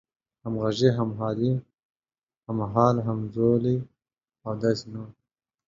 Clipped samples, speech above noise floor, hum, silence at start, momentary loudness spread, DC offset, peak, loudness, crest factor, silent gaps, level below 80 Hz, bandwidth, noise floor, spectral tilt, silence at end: under 0.1%; over 65 dB; none; 0.45 s; 18 LU; under 0.1%; -6 dBFS; -26 LUFS; 20 dB; 1.85-1.95 s, 2.23-2.27 s, 2.38-2.42 s; -58 dBFS; 7.6 kHz; under -90 dBFS; -8 dB/octave; 0.55 s